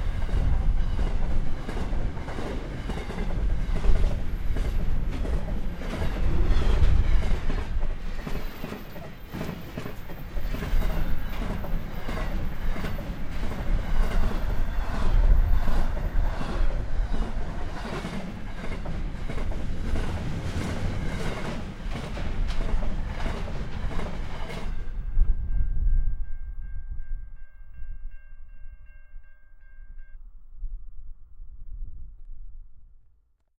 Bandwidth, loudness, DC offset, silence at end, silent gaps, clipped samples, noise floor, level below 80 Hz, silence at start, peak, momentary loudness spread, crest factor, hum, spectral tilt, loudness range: 15.5 kHz; -32 LUFS; under 0.1%; 0.6 s; none; under 0.1%; -61 dBFS; -26 dBFS; 0 s; -8 dBFS; 19 LU; 18 dB; none; -6.5 dB/octave; 18 LU